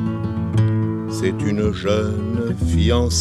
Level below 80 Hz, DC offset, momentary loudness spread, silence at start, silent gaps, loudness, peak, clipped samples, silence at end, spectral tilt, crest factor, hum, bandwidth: -30 dBFS; under 0.1%; 5 LU; 0 s; none; -20 LUFS; -4 dBFS; under 0.1%; 0 s; -6 dB/octave; 16 dB; none; 13 kHz